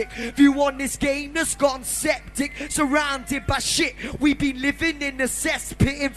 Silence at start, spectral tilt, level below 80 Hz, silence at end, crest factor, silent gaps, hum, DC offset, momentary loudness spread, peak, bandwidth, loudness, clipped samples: 0 s; -3.5 dB/octave; -40 dBFS; 0 s; 18 dB; none; none; under 0.1%; 7 LU; -6 dBFS; 13 kHz; -22 LUFS; under 0.1%